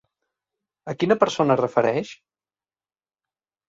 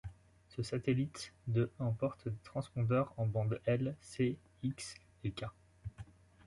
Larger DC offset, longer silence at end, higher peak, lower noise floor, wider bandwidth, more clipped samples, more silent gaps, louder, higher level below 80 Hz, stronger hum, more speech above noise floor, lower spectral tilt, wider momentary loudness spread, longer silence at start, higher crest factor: neither; first, 1.55 s vs 0.45 s; first, -4 dBFS vs -20 dBFS; first, under -90 dBFS vs -58 dBFS; second, 7.8 kHz vs 11.5 kHz; neither; neither; first, -21 LUFS vs -38 LUFS; about the same, -66 dBFS vs -62 dBFS; neither; first, over 69 dB vs 21 dB; about the same, -6 dB/octave vs -7 dB/octave; about the same, 17 LU vs 16 LU; first, 0.85 s vs 0.05 s; about the same, 22 dB vs 18 dB